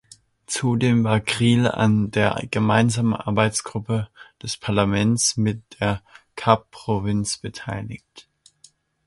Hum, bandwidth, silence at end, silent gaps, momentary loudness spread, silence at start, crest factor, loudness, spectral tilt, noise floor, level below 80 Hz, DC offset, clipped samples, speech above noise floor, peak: none; 11.5 kHz; 0.85 s; none; 12 LU; 0.5 s; 22 dB; -22 LUFS; -5 dB/octave; -56 dBFS; -48 dBFS; under 0.1%; under 0.1%; 34 dB; 0 dBFS